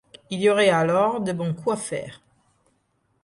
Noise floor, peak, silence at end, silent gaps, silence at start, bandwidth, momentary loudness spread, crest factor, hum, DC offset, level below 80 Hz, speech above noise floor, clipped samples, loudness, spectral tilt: -69 dBFS; -6 dBFS; 1.1 s; none; 0.3 s; 11.5 kHz; 14 LU; 18 dB; none; under 0.1%; -64 dBFS; 47 dB; under 0.1%; -22 LUFS; -5 dB/octave